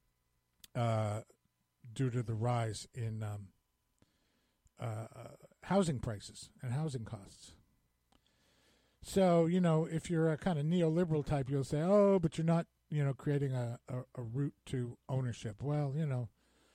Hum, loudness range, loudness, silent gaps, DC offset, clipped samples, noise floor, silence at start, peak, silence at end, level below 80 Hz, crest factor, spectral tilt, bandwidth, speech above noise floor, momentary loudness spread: none; 9 LU; -35 LUFS; none; under 0.1%; under 0.1%; -80 dBFS; 0.75 s; -18 dBFS; 0.45 s; -62 dBFS; 18 dB; -7.5 dB/octave; 13.5 kHz; 46 dB; 16 LU